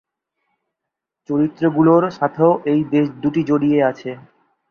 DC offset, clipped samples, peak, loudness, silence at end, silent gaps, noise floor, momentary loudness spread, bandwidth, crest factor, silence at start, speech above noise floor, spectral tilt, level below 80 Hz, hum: under 0.1%; under 0.1%; -2 dBFS; -17 LUFS; 0.5 s; none; -82 dBFS; 9 LU; 6.6 kHz; 16 dB; 1.3 s; 65 dB; -9 dB/octave; -58 dBFS; none